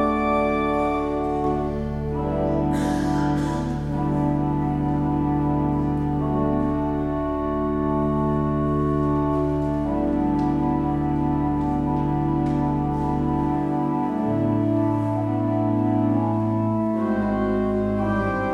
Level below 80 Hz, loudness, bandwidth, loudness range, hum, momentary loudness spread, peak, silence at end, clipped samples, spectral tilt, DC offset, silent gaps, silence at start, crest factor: -36 dBFS; -23 LUFS; 11 kHz; 1 LU; none; 3 LU; -10 dBFS; 0 s; under 0.1%; -9 dB/octave; under 0.1%; none; 0 s; 12 dB